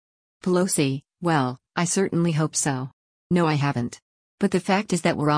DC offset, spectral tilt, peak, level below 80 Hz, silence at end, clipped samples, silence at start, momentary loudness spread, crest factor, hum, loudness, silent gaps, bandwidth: under 0.1%; -5 dB/octave; -8 dBFS; -60 dBFS; 0 s; under 0.1%; 0.45 s; 7 LU; 16 dB; none; -24 LUFS; 2.93-3.30 s, 4.02-4.38 s; 10.5 kHz